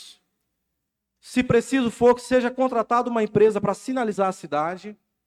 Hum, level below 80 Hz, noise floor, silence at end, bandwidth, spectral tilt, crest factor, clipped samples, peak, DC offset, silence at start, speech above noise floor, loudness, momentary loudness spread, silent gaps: none; -56 dBFS; -80 dBFS; 0.35 s; 13 kHz; -6 dB/octave; 16 dB; under 0.1%; -6 dBFS; under 0.1%; 0 s; 58 dB; -22 LUFS; 7 LU; none